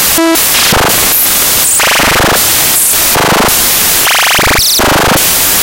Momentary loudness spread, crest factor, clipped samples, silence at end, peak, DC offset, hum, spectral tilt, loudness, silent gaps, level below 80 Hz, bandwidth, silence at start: 1 LU; 8 dB; 0.3%; 0 s; 0 dBFS; under 0.1%; none; -1.5 dB/octave; -5 LUFS; none; -26 dBFS; over 20 kHz; 0 s